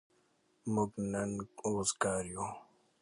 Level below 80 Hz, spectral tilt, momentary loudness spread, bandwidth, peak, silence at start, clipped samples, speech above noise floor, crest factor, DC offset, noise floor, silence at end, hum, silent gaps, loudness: -64 dBFS; -4.5 dB/octave; 10 LU; 11.5 kHz; -18 dBFS; 0.65 s; under 0.1%; 37 dB; 20 dB; under 0.1%; -73 dBFS; 0.4 s; none; none; -36 LUFS